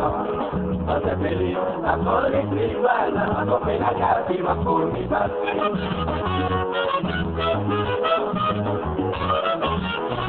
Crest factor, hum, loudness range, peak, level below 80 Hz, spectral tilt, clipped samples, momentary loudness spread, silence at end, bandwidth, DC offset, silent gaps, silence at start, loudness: 16 dB; none; 1 LU; -6 dBFS; -40 dBFS; -10 dB/octave; under 0.1%; 4 LU; 0 s; 4.5 kHz; under 0.1%; none; 0 s; -23 LUFS